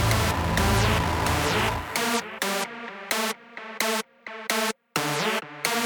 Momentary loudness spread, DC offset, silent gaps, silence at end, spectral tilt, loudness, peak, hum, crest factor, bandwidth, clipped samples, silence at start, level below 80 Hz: 9 LU; under 0.1%; none; 0 s; -3.5 dB/octave; -25 LUFS; -4 dBFS; none; 22 dB; over 20 kHz; under 0.1%; 0 s; -38 dBFS